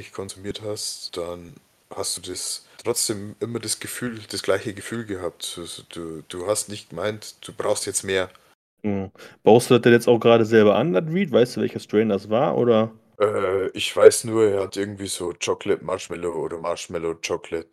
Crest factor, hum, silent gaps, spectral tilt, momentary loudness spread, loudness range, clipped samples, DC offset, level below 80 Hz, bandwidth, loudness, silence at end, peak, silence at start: 22 dB; none; 8.55-8.77 s; -4.5 dB/octave; 16 LU; 10 LU; under 0.1%; under 0.1%; -62 dBFS; 15 kHz; -22 LUFS; 0.1 s; 0 dBFS; 0 s